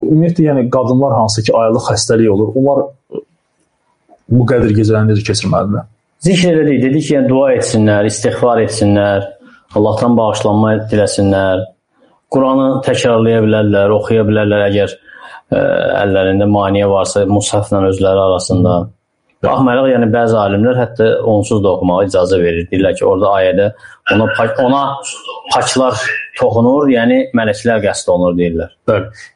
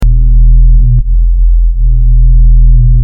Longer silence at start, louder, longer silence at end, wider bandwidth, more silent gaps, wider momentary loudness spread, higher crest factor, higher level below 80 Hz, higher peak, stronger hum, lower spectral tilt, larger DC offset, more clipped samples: about the same, 0 s vs 0 s; second, -12 LUFS vs -9 LUFS; about the same, 0.1 s vs 0 s; first, 10.5 kHz vs 0.5 kHz; neither; about the same, 6 LU vs 4 LU; first, 10 dB vs 4 dB; second, -42 dBFS vs -4 dBFS; about the same, 0 dBFS vs 0 dBFS; neither; second, -6 dB/octave vs -10 dB/octave; neither; neither